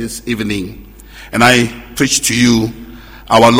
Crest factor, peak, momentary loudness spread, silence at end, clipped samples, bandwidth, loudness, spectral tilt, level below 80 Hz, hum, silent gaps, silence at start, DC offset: 14 dB; 0 dBFS; 15 LU; 0 s; 0.3%; 16.5 kHz; -13 LUFS; -3.5 dB/octave; -36 dBFS; none; none; 0 s; under 0.1%